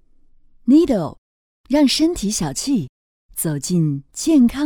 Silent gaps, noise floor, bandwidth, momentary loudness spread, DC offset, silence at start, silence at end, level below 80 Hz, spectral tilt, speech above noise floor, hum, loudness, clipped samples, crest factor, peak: 1.18-1.64 s, 2.89-3.29 s; -50 dBFS; 19 kHz; 11 LU; under 0.1%; 0.65 s; 0 s; -44 dBFS; -5 dB/octave; 33 dB; none; -18 LUFS; under 0.1%; 14 dB; -4 dBFS